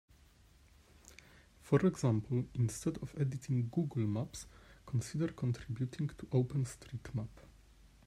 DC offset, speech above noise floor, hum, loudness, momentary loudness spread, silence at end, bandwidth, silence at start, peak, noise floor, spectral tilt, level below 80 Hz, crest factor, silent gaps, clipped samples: under 0.1%; 28 dB; none; -37 LUFS; 17 LU; 0.65 s; 13 kHz; 1.1 s; -16 dBFS; -64 dBFS; -7.5 dB/octave; -60 dBFS; 20 dB; none; under 0.1%